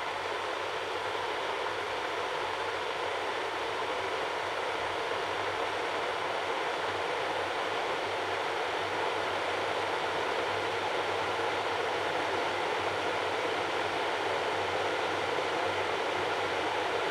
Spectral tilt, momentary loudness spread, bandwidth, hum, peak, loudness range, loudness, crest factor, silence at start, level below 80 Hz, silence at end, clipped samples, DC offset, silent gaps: -3 dB/octave; 2 LU; 16 kHz; none; -18 dBFS; 2 LU; -32 LUFS; 14 dB; 0 s; -68 dBFS; 0 s; under 0.1%; under 0.1%; none